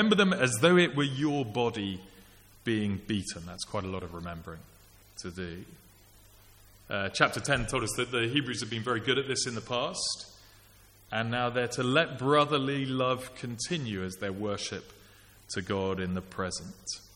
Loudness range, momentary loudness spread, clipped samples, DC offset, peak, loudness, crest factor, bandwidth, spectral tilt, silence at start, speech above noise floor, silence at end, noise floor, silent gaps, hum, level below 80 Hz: 8 LU; 15 LU; under 0.1%; under 0.1%; -6 dBFS; -30 LUFS; 26 dB; 17 kHz; -4.5 dB/octave; 0 s; 27 dB; 0.1 s; -58 dBFS; none; none; -56 dBFS